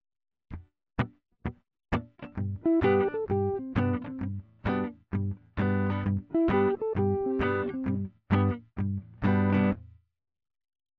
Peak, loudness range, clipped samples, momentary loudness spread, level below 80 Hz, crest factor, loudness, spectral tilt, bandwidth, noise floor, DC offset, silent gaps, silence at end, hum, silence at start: -12 dBFS; 2 LU; under 0.1%; 13 LU; -50 dBFS; 16 dB; -29 LUFS; -10 dB/octave; 4.9 kHz; -51 dBFS; under 0.1%; none; 1.1 s; none; 0.5 s